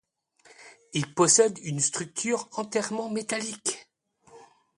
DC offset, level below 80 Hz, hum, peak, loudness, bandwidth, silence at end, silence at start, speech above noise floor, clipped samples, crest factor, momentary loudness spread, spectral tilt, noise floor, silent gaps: under 0.1%; -72 dBFS; none; -8 dBFS; -26 LUFS; 11.5 kHz; 0.35 s; 0.6 s; 36 dB; under 0.1%; 22 dB; 12 LU; -3 dB/octave; -62 dBFS; none